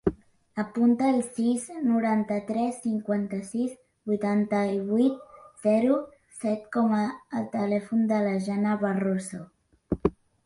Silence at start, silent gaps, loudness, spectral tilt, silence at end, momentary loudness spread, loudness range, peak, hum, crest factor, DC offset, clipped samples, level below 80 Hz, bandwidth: 0.05 s; none; -27 LUFS; -7 dB/octave; 0.35 s; 9 LU; 2 LU; -8 dBFS; none; 18 dB; under 0.1%; under 0.1%; -54 dBFS; 11.5 kHz